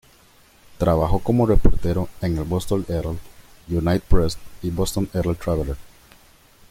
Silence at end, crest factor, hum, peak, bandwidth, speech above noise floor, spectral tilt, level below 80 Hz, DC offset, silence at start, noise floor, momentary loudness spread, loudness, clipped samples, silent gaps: 0.9 s; 20 dB; none; -2 dBFS; 15.5 kHz; 34 dB; -7 dB/octave; -28 dBFS; under 0.1%; 0.8 s; -53 dBFS; 10 LU; -23 LUFS; under 0.1%; none